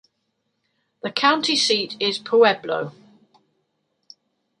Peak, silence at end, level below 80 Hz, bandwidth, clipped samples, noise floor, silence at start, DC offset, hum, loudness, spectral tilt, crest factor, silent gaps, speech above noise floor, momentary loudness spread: -2 dBFS; 1.7 s; -74 dBFS; 11.5 kHz; under 0.1%; -74 dBFS; 1.05 s; under 0.1%; none; -19 LUFS; -2.5 dB/octave; 22 dB; none; 54 dB; 11 LU